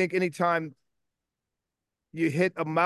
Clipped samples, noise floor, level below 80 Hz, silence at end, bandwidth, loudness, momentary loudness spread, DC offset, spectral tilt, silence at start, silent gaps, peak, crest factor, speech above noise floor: under 0.1%; -87 dBFS; -76 dBFS; 0 s; 12.5 kHz; -27 LUFS; 12 LU; under 0.1%; -6.5 dB/octave; 0 s; none; -10 dBFS; 18 dB; 61 dB